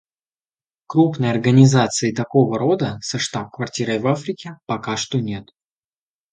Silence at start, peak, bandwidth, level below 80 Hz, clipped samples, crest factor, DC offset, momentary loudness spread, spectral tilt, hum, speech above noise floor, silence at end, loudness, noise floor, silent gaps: 0.9 s; 0 dBFS; 9.4 kHz; -56 dBFS; under 0.1%; 18 dB; under 0.1%; 14 LU; -5.5 dB/octave; none; over 72 dB; 0.9 s; -19 LUFS; under -90 dBFS; none